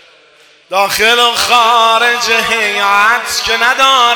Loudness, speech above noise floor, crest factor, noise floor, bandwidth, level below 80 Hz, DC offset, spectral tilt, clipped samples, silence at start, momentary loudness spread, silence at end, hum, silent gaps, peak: -9 LUFS; 35 dB; 12 dB; -45 dBFS; over 20 kHz; -48 dBFS; under 0.1%; 0 dB/octave; 0.9%; 0.7 s; 5 LU; 0 s; none; none; 0 dBFS